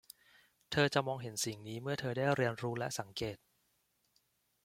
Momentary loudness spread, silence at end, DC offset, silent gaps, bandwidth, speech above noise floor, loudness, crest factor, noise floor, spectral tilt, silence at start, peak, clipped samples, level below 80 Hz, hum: 10 LU; 1.3 s; under 0.1%; none; 16.5 kHz; 42 dB; -36 LUFS; 22 dB; -78 dBFS; -4.5 dB/octave; 0.7 s; -16 dBFS; under 0.1%; -70 dBFS; none